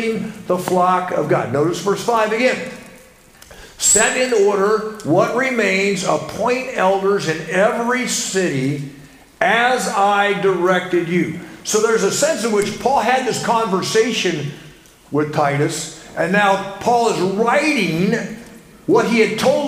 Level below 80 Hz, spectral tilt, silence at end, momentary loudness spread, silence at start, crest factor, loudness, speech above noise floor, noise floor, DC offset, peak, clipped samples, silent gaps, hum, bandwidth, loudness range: -54 dBFS; -4 dB/octave; 0 s; 8 LU; 0 s; 16 dB; -17 LUFS; 28 dB; -45 dBFS; under 0.1%; 0 dBFS; under 0.1%; none; none; 16 kHz; 2 LU